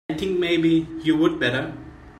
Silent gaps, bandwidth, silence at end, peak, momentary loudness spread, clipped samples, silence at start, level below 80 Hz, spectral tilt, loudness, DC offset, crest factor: none; 9.4 kHz; 0.05 s; -6 dBFS; 10 LU; under 0.1%; 0.1 s; -50 dBFS; -6.5 dB/octave; -22 LUFS; under 0.1%; 16 dB